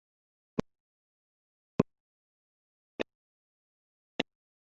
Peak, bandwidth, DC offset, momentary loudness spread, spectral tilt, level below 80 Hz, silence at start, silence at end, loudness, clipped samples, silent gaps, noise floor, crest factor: -8 dBFS; 1 kHz; under 0.1%; 9 LU; -1 dB/octave; -64 dBFS; 1.8 s; 0.45 s; -37 LUFS; under 0.1%; 2.00-2.99 s, 3.15-4.19 s; under -90 dBFS; 34 dB